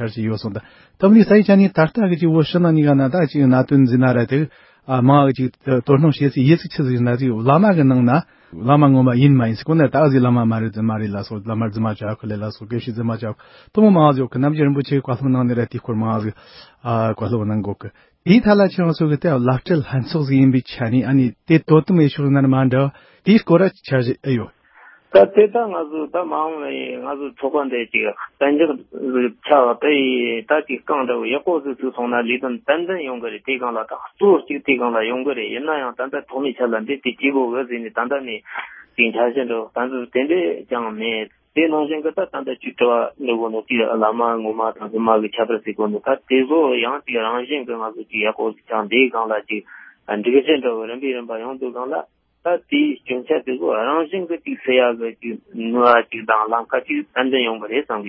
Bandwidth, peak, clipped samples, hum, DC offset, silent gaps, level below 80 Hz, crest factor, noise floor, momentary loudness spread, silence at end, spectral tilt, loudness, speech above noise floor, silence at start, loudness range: 5.8 kHz; 0 dBFS; under 0.1%; none; under 0.1%; none; -54 dBFS; 18 dB; -48 dBFS; 12 LU; 0 s; -12 dB/octave; -18 LUFS; 31 dB; 0 s; 6 LU